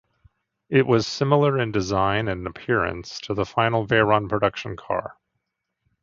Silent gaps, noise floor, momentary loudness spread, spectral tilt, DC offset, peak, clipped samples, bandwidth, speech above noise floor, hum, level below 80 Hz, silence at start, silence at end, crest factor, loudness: none; -79 dBFS; 10 LU; -6 dB/octave; under 0.1%; -2 dBFS; under 0.1%; 7.6 kHz; 57 dB; none; -48 dBFS; 0.7 s; 0.9 s; 20 dB; -22 LUFS